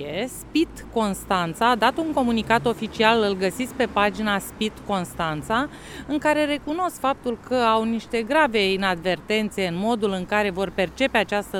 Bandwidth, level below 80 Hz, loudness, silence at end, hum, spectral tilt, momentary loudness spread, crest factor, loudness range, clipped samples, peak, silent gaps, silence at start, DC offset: 18 kHz; -48 dBFS; -23 LUFS; 0 s; none; -4.5 dB/octave; 7 LU; 20 dB; 3 LU; under 0.1%; -4 dBFS; none; 0 s; under 0.1%